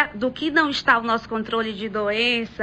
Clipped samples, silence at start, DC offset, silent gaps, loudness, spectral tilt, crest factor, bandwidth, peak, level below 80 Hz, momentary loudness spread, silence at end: under 0.1%; 0 s; under 0.1%; none; -21 LUFS; -4 dB/octave; 18 dB; 9 kHz; -4 dBFS; -52 dBFS; 7 LU; 0 s